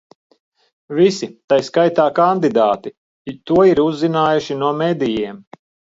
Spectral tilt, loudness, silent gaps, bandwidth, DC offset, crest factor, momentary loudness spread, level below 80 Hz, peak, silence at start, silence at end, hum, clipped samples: -6.5 dB/octave; -16 LUFS; 1.44-1.48 s, 2.97-3.25 s; 7.8 kHz; under 0.1%; 16 dB; 14 LU; -56 dBFS; -2 dBFS; 0.9 s; 0.55 s; none; under 0.1%